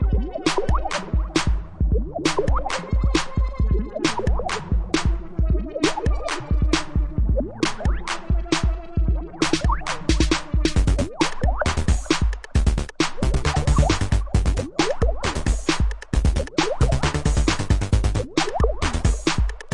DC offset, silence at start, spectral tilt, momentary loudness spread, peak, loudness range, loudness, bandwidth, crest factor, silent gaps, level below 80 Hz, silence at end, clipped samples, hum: under 0.1%; 0 s; -5 dB/octave; 4 LU; -4 dBFS; 2 LU; -23 LUFS; 11.5 kHz; 16 dB; none; -24 dBFS; 0 s; under 0.1%; none